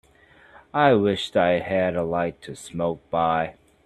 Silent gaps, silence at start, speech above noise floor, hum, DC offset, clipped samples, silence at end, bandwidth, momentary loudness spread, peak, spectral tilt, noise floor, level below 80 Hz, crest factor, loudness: none; 0.75 s; 32 dB; none; under 0.1%; under 0.1%; 0.35 s; 12.5 kHz; 11 LU; -2 dBFS; -6 dB/octave; -54 dBFS; -56 dBFS; 20 dB; -23 LUFS